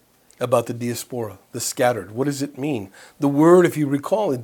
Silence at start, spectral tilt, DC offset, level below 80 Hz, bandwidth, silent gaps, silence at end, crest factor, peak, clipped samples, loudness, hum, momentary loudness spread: 0.4 s; -5.5 dB/octave; under 0.1%; -68 dBFS; 18.5 kHz; none; 0 s; 20 dB; -2 dBFS; under 0.1%; -21 LUFS; none; 16 LU